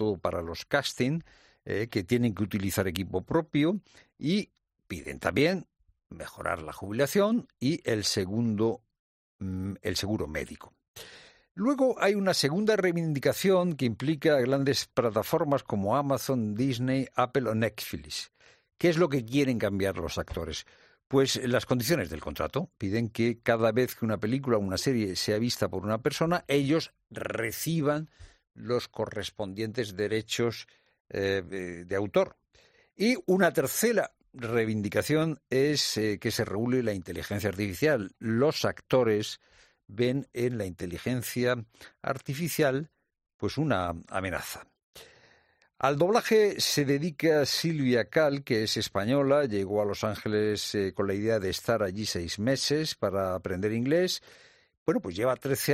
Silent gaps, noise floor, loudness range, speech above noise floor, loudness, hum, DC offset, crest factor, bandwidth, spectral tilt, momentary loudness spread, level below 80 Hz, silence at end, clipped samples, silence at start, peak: 8.99-9.39 s, 10.88-10.94 s, 11.51-11.55 s, 31.00-31.05 s, 43.34-43.39 s, 44.83-44.93 s, 54.77-54.86 s; -65 dBFS; 5 LU; 37 dB; -29 LUFS; none; under 0.1%; 20 dB; 15 kHz; -5 dB/octave; 10 LU; -60 dBFS; 0 s; under 0.1%; 0 s; -8 dBFS